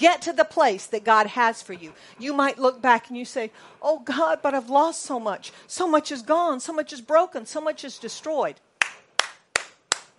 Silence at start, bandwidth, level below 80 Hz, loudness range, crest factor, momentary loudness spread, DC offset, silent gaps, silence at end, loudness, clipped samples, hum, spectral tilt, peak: 0 s; 11.5 kHz; -70 dBFS; 3 LU; 24 dB; 14 LU; under 0.1%; none; 0.15 s; -24 LUFS; under 0.1%; none; -2 dB/octave; 0 dBFS